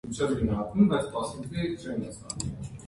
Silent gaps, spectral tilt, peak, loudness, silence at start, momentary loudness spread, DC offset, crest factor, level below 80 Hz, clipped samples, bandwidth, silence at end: none; -6 dB/octave; -10 dBFS; -29 LUFS; 0.05 s; 11 LU; under 0.1%; 18 dB; -46 dBFS; under 0.1%; 11.5 kHz; 0 s